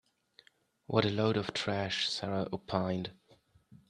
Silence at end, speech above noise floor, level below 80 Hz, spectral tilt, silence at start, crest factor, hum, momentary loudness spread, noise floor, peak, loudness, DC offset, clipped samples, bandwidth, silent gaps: 0.15 s; 33 dB; -68 dBFS; -5.5 dB/octave; 0.9 s; 24 dB; none; 6 LU; -66 dBFS; -10 dBFS; -33 LUFS; under 0.1%; under 0.1%; 10.5 kHz; none